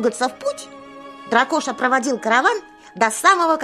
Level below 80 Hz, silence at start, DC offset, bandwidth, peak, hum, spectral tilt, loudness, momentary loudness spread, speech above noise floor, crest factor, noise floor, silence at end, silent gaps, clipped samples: -68 dBFS; 0 s; under 0.1%; 15.5 kHz; -2 dBFS; none; -2 dB/octave; -18 LUFS; 22 LU; 20 dB; 18 dB; -38 dBFS; 0 s; none; under 0.1%